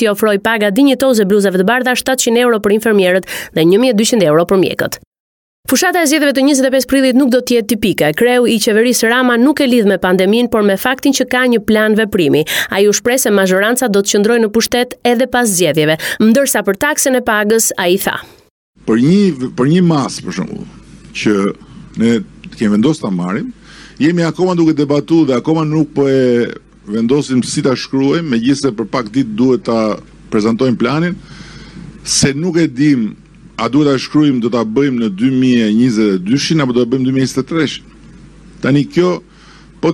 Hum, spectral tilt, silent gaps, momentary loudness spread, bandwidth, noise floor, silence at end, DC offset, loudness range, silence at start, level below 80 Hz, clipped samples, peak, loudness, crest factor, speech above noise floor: none; -4.5 dB/octave; 5.07-5.12 s, 5.20-5.63 s, 18.50-18.73 s; 8 LU; 18 kHz; -40 dBFS; 0 s; under 0.1%; 4 LU; 0 s; -46 dBFS; under 0.1%; -2 dBFS; -12 LUFS; 12 dB; 28 dB